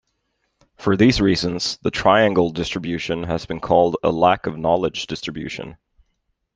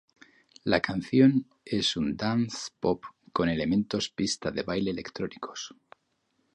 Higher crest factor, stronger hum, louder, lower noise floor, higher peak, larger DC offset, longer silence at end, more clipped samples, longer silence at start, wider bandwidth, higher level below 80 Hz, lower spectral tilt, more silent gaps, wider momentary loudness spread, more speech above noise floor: about the same, 18 dB vs 22 dB; neither; first, -19 LUFS vs -28 LUFS; about the same, -72 dBFS vs -74 dBFS; first, -2 dBFS vs -6 dBFS; neither; about the same, 0.8 s vs 0.85 s; neither; first, 0.8 s vs 0.65 s; about the same, 9.8 kHz vs 10.5 kHz; first, -44 dBFS vs -56 dBFS; about the same, -5.5 dB/octave vs -5 dB/octave; neither; about the same, 12 LU vs 13 LU; first, 52 dB vs 47 dB